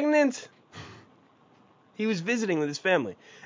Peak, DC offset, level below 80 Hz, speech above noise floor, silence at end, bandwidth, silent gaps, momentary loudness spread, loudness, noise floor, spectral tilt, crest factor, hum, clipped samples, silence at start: -10 dBFS; under 0.1%; -72 dBFS; 31 dB; 0 s; 7.6 kHz; none; 22 LU; -27 LUFS; -60 dBFS; -5 dB/octave; 18 dB; none; under 0.1%; 0 s